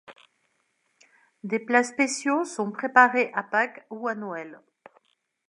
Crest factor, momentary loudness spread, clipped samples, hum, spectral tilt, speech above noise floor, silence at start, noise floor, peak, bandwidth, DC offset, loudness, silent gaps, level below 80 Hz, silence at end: 24 dB; 16 LU; under 0.1%; none; -3.5 dB/octave; 47 dB; 0.1 s; -72 dBFS; -2 dBFS; 11.5 kHz; under 0.1%; -24 LUFS; none; -86 dBFS; 0.95 s